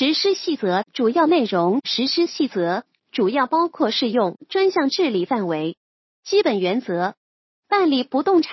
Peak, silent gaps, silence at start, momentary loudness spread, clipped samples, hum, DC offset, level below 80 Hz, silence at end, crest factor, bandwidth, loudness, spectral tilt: -4 dBFS; 5.77-6.23 s, 7.17-7.63 s; 0 s; 6 LU; under 0.1%; none; under 0.1%; -76 dBFS; 0 s; 16 dB; 6.2 kHz; -20 LUFS; -5 dB/octave